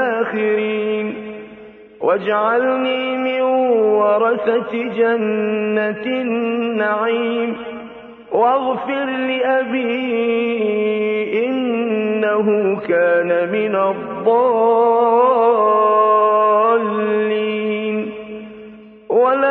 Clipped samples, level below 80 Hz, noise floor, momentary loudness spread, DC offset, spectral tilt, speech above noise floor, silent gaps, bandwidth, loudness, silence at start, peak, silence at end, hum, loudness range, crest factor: under 0.1%; -64 dBFS; -39 dBFS; 9 LU; under 0.1%; -8.5 dB/octave; 23 dB; none; 4.1 kHz; -17 LUFS; 0 s; -4 dBFS; 0 s; none; 5 LU; 14 dB